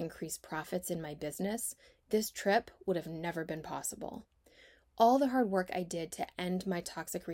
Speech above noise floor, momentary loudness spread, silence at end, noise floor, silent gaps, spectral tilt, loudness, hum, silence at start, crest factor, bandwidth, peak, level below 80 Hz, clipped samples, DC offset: 28 dB; 11 LU; 0 s; -63 dBFS; none; -4.5 dB/octave; -35 LUFS; none; 0 s; 20 dB; 16 kHz; -14 dBFS; -66 dBFS; under 0.1%; under 0.1%